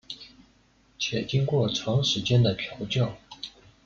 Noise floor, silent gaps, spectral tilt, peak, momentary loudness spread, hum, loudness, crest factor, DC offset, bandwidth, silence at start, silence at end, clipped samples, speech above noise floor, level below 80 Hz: -62 dBFS; none; -5.5 dB/octave; -12 dBFS; 18 LU; none; -26 LUFS; 16 dB; under 0.1%; 7.2 kHz; 0.1 s; 0.35 s; under 0.1%; 37 dB; -56 dBFS